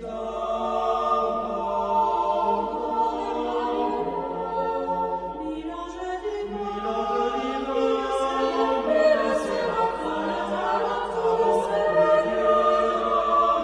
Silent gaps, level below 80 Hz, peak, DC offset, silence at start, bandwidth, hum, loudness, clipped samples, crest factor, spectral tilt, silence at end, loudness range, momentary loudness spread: none; -50 dBFS; -8 dBFS; under 0.1%; 0 s; 11 kHz; none; -24 LUFS; under 0.1%; 16 dB; -5 dB/octave; 0 s; 6 LU; 10 LU